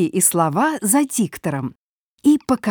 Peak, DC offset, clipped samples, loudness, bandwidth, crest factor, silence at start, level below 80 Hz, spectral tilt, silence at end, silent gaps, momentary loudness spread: -2 dBFS; under 0.1%; under 0.1%; -18 LUFS; over 20 kHz; 18 dB; 0 s; -58 dBFS; -4.5 dB/octave; 0 s; 1.76-2.18 s; 9 LU